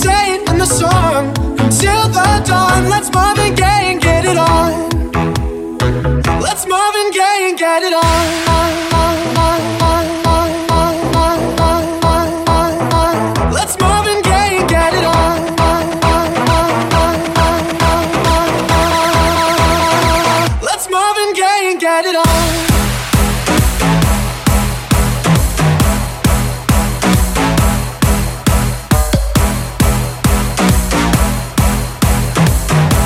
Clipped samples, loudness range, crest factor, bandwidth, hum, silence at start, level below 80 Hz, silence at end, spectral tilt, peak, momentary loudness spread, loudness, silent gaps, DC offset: under 0.1%; 2 LU; 12 dB; 16.5 kHz; none; 0 s; -20 dBFS; 0 s; -4.5 dB/octave; 0 dBFS; 4 LU; -13 LUFS; none; under 0.1%